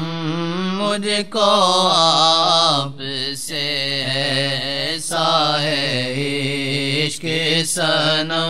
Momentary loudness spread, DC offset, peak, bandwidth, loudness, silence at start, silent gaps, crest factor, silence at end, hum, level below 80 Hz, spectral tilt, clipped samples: 9 LU; 1%; -2 dBFS; 16 kHz; -17 LUFS; 0 s; none; 18 dB; 0 s; none; -62 dBFS; -3.5 dB/octave; under 0.1%